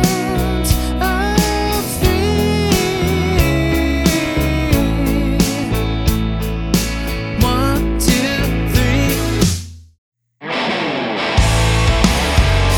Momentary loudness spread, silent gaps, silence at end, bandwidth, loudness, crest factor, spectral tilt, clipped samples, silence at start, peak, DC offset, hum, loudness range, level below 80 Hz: 5 LU; 9.98-10.12 s; 0 s; 19.5 kHz; -16 LUFS; 14 dB; -5 dB/octave; under 0.1%; 0 s; -2 dBFS; under 0.1%; none; 2 LU; -22 dBFS